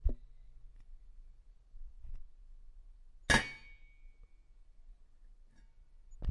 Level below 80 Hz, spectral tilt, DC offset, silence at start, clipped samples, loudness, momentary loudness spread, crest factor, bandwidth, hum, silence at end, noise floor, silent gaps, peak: -46 dBFS; -3 dB/octave; under 0.1%; 0 s; under 0.1%; -33 LUFS; 30 LU; 28 dB; 10.5 kHz; none; 0 s; -59 dBFS; none; -14 dBFS